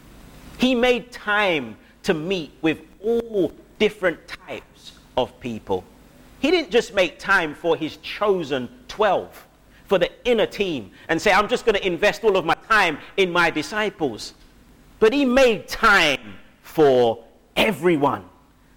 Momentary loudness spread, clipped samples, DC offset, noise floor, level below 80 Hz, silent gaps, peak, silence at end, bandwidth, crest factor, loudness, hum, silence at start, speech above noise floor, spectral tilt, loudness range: 12 LU; under 0.1%; under 0.1%; -50 dBFS; -46 dBFS; none; -6 dBFS; 0.5 s; 17.5 kHz; 16 dB; -21 LUFS; none; 0.25 s; 29 dB; -4.5 dB/octave; 6 LU